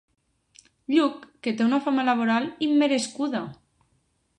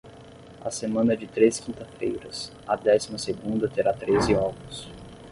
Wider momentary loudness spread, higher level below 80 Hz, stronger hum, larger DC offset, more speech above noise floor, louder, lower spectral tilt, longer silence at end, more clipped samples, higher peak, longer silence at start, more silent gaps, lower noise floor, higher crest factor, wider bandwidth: second, 10 LU vs 16 LU; second, -72 dBFS vs -50 dBFS; neither; neither; first, 46 dB vs 21 dB; about the same, -24 LUFS vs -25 LUFS; about the same, -4.5 dB/octave vs -5 dB/octave; first, 0.85 s vs 0 s; neither; about the same, -8 dBFS vs -6 dBFS; first, 0.9 s vs 0.05 s; neither; first, -69 dBFS vs -46 dBFS; about the same, 18 dB vs 20 dB; about the same, 11 kHz vs 11.5 kHz